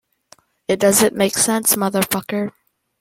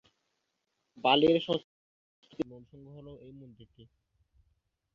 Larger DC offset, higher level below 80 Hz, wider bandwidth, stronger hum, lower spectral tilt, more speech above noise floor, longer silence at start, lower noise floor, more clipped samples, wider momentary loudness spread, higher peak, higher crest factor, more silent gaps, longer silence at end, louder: neither; first, -56 dBFS vs -68 dBFS; first, 16.5 kHz vs 7.2 kHz; neither; second, -3 dB/octave vs -6.5 dB/octave; second, 35 dB vs 51 dB; second, 0.7 s vs 1.05 s; second, -53 dBFS vs -82 dBFS; neither; second, 11 LU vs 27 LU; first, -2 dBFS vs -10 dBFS; second, 18 dB vs 24 dB; second, none vs 1.64-2.22 s; second, 0.5 s vs 1.55 s; first, -17 LUFS vs -29 LUFS